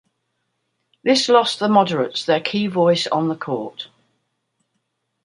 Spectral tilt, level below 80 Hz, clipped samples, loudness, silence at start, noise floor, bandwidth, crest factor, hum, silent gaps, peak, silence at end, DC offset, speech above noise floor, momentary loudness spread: -4.5 dB/octave; -68 dBFS; under 0.1%; -18 LUFS; 1.05 s; -73 dBFS; 11 kHz; 18 dB; none; none; -2 dBFS; 1.4 s; under 0.1%; 55 dB; 11 LU